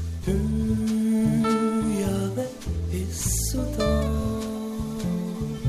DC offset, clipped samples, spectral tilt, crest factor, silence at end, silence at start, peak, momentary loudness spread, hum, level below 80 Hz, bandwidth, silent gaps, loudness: under 0.1%; under 0.1%; -6 dB/octave; 14 dB; 0 s; 0 s; -12 dBFS; 8 LU; none; -34 dBFS; 14 kHz; none; -26 LUFS